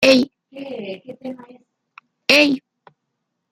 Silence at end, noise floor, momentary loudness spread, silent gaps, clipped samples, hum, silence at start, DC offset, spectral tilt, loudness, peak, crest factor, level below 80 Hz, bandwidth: 0.95 s; -76 dBFS; 21 LU; none; under 0.1%; none; 0 s; under 0.1%; -3 dB/octave; -16 LUFS; 0 dBFS; 20 dB; -64 dBFS; 16 kHz